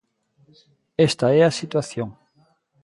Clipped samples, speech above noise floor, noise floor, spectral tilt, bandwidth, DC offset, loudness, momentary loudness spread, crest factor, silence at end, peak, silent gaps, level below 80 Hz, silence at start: under 0.1%; 42 dB; -62 dBFS; -5.5 dB/octave; 11.5 kHz; under 0.1%; -21 LUFS; 15 LU; 18 dB; 0.7 s; -6 dBFS; none; -60 dBFS; 1 s